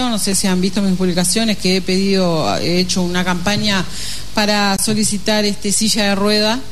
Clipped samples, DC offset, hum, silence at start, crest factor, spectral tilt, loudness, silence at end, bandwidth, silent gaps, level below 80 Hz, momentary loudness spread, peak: under 0.1%; 7%; 50 Hz at -40 dBFS; 0 s; 14 dB; -3.5 dB/octave; -16 LUFS; 0 s; 13.5 kHz; none; -38 dBFS; 3 LU; -2 dBFS